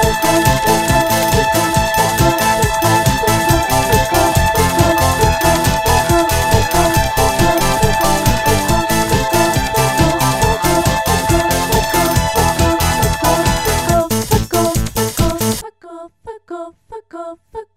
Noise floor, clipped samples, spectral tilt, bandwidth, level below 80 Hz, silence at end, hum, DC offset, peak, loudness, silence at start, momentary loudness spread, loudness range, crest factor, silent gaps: -35 dBFS; under 0.1%; -4 dB/octave; 16.5 kHz; -26 dBFS; 0.15 s; none; under 0.1%; 0 dBFS; -14 LUFS; 0 s; 5 LU; 3 LU; 14 dB; none